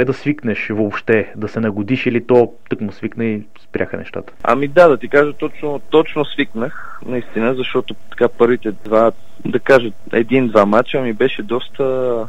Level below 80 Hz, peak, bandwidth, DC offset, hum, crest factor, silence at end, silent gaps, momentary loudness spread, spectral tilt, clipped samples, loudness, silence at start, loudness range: -52 dBFS; 0 dBFS; 10.5 kHz; 6%; none; 16 dB; 0 s; none; 12 LU; -7.5 dB/octave; under 0.1%; -16 LUFS; 0 s; 3 LU